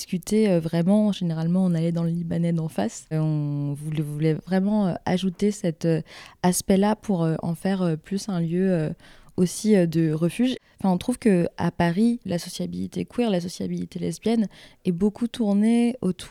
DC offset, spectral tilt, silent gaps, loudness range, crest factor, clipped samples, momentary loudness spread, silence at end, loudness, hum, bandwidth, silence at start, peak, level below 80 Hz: under 0.1%; -6.5 dB/octave; none; 2 LU; 16 dB; under 0.1%; 9 LU; 0 s; -24 LUFS; none; 15 kHz; 0 s; -8 dBFS; -54 dBFS